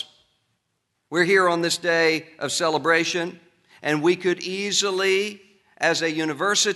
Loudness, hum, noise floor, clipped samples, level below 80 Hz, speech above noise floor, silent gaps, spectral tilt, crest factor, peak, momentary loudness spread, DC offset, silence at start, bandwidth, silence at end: -22 LUFS; none; -75 dBFS; under 0.1%; -72 dBFS; 53 dB; none; -2.5 dB/octave; 18 dB; -6 dBFS; 9 LU; under 0.1%; 0 s; 12 kHz; 0 s